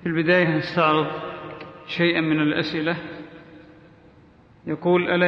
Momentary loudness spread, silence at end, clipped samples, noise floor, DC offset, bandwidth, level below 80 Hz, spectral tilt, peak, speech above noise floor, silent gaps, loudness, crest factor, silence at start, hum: 19 LU; 0 s; under 0.1%; -52 dBFS; under 0.1%; 6.2 kHz; -60 dBFS; -7.5 dB/octave; -6 dBFS; 31 dB; none; -22 LUFS; 18 dB; 0 s; none